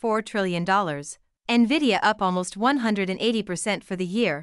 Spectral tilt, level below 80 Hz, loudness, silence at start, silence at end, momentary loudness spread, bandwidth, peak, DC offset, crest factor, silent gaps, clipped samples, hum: -4.5 dB/octave; -60 dBFS; -23 LUFS; 0.05 s; 0 s; 8 LU; 12 kHz; -8 dBFS; under 0.1%; 16 dB; none; under 0.1%; none